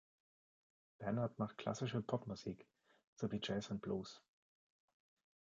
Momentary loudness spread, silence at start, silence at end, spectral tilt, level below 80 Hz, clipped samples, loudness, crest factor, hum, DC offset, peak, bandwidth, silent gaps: 9 LU; 1 s; 1.25 s; -6 dB/octave; -74 dBFS; under 0.1%; -44 LUFS; 24 dB; none; under 0.1%; -22 dBFS; 7.6 kHz; 3.07-3.16 s